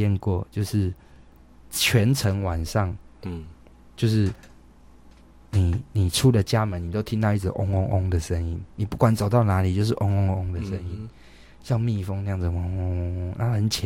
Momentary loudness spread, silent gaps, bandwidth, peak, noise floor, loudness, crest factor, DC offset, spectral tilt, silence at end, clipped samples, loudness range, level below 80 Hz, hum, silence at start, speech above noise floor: 12 LU; none; 16.5 kHz; -8 dBFS; -50 dBFS; -24 LUFS; 18 dB; under 0.1%; -6 dB/octave; 0 s; under 0.1%; 5 LU; -40 dBFS; none; 0 s; 27 dB